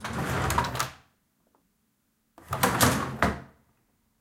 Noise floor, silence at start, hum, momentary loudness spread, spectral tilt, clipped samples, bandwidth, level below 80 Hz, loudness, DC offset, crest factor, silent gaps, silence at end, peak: -73 dBFS; 0 s; none; 12 LU; -4 dB/octave; under 0.1%; 17 kHz; -46 dBFS; -27 LUFS; under 0.1%; 26 dB; none; 0.75 s; -4 dBFS